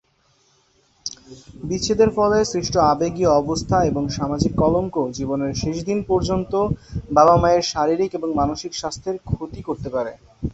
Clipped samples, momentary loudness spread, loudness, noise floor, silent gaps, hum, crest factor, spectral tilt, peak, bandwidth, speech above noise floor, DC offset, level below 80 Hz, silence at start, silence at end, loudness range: under 0.1%; 13 LU; -20 LUFS; -61 dBFS; none; none; 18 dB; -5.5 dB/octave; -2 dBFS; 8.2 kHz; 41 dB; under 0.1%; -38 dBFS; 1.05 s; 0 s; 2 LU